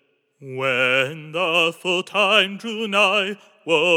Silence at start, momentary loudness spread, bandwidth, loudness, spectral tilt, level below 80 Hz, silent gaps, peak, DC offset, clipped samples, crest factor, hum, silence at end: 0.4 s; 10 LU; 17 kHz; -19 LUFS; -3.5 dB/octave; under -90 dBFS; none; -2 dBFS; under 0.1%; under 0.1%; 20 dB; none; 0 s